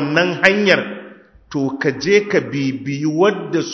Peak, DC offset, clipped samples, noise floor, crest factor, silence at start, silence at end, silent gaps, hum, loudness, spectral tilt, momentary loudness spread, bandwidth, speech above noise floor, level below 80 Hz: 0 dBFS; under 0.1%; under 0.1%; -41 dBFS; 18 dB; 0 s; 0 s; none; none; -17 LUFS; -5 dB/octave; 9 LU; 8 kHz; 25 dB; -56 dBFS